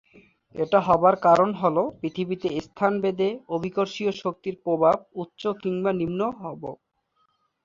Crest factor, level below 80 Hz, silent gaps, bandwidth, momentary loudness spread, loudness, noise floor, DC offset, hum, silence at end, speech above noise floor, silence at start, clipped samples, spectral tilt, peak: 20 dB; -60 dBFS; none; 7.6 kHz; 13 LU; -24 LUFS; -70 dBFS; under 0.1%; none; 0.9 s; 46 dB; 0.55 s; under 0.1%; -7 dB/octave; -4 dBFS